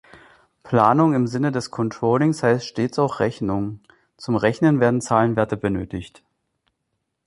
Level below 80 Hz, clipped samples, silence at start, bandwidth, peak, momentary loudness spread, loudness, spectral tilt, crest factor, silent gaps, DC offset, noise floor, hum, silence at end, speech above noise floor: -52 dBFS; under 0.1%; 0.65 s; 11.5 kHz; -4 dBFS; 10 LU; -20 LUFS; -7 dB/octave; 18 dB; none; under 0.1%; -76 dBFS; none; 1.2 s; 56 dB